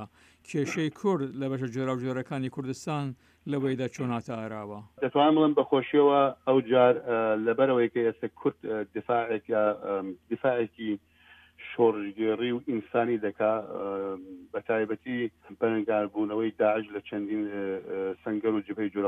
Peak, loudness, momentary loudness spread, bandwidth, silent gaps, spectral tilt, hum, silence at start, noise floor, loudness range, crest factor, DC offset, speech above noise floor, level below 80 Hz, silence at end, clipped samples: -10 dBFS; -28 LUFS; 12 LU; 9.6 kHz; none; -7 dB/octave; none; 0 s; -56 dBFS; 7 LU; 18 dB; under 0.1%; 28 dB; -72 dBFS; 0 s; under 0.1%